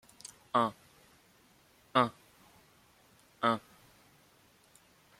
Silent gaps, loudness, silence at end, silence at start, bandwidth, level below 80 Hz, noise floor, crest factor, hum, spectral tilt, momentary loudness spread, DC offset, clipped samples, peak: none; -32 LUFS; 1.6 s; 0.55 s; 16.5 kHz; -76 dBFS; -65 dBFS; 28 dB; none; -5 dB/octave; 13 LU; under 0.1%; under 0.1%; -10 dBFS